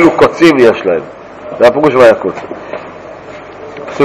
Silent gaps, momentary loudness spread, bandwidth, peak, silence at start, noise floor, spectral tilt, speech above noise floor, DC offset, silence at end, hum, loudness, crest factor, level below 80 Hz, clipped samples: none; 22 LU; 14.5 kHz; 0 dBFS; 0 s; -29 dBFS; -6 dB/octave; 21 dB; under 0.1%; 0 s; none; -8 LUFS; 10 dB; -44 dBFS; 5%